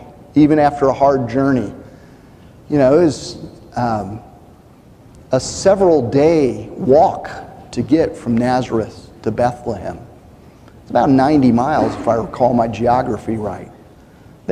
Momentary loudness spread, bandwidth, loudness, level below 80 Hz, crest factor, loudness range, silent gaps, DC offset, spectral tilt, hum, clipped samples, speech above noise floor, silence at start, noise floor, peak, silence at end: 16 LU; 10.5 kHz; -16 LUFS; -42 dBFS; 14 dB; 4 LU; none; under 0.1%; -7 dB/octave; none; under 0.1%; 29 dB; 0 s; -44 dBFS; -2 dBFS; 0 s